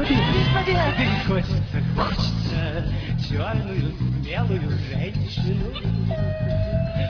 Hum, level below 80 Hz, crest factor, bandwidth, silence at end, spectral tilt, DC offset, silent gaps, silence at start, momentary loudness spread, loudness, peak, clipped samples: none; -32 dBFS; 16 dB; 5.4 kHz; 0 s; -7.5 dB/octave; under 0.1%; none; 0 s; 6 LU; -23 LUFS; -6 dBFS; under 0.1%